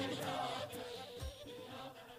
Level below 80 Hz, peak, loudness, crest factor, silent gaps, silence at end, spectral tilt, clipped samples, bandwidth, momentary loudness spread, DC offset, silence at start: -60 dBFS; -28 dBFS; -45 LUFS; 16 dB; none; 0 s; -4 dB/octave; under 0.1%; 15.5 kHz; 10 LU; under 0.1%; 0 s